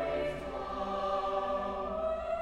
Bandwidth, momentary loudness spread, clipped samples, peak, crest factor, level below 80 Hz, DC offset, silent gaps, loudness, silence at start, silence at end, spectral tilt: 11 kHz; 4 LU; under 0.1%; -20 dBFS; 14 dB; -52 dBFS; under 0.1%; none; -35 LUFS; 0 s; 0 s; -6 dB/octave